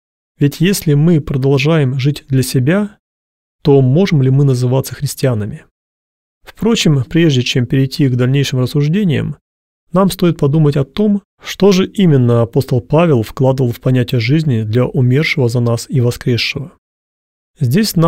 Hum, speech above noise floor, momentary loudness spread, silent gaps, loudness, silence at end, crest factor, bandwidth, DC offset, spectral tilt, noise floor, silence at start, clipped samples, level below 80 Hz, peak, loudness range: none; over 78 dB; 6 LU; 2.99-3.59 s, 5.71-6.41 s, 9.41-9.87 s, 11.25-11.38 s, 16.78-17.54 s; -13 LUFS; 0 s; 12 dB; 16 kHz; 0.5%; -6.5 dB/octave; under -90 dBFS; 0.4 s; under 0.1%; -42 dBFS; 0 dBFS; 2 LU